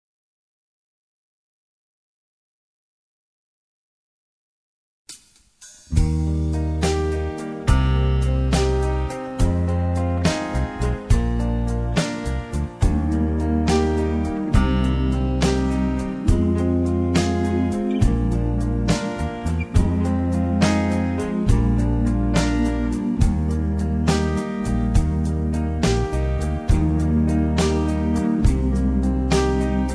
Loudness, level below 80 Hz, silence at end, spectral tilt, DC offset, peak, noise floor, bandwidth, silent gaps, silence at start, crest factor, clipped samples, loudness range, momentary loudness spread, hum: -21 LUFS; -26 dBFS; 0 s; -7 dB/octave; under 0.1%; -4 dBFS; -51 dBFS; 11 kHz; none; 5.1 s; 16 dB; under 0.1%; 2 LU; 5 LU; none